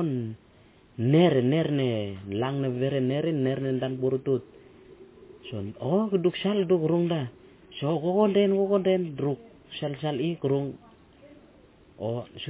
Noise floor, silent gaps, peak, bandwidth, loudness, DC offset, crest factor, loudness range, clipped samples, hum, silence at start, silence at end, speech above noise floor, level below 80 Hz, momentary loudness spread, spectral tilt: -56 dBFS; none; -10 dBFS; 4 kHz; -27 LUFS; under 0.1%; 16 dB; 4 LU; under 0.1%; none; 0 s; 0 s; 31 dB; -62 dBFS; 15 LU; -11.5 dB/octave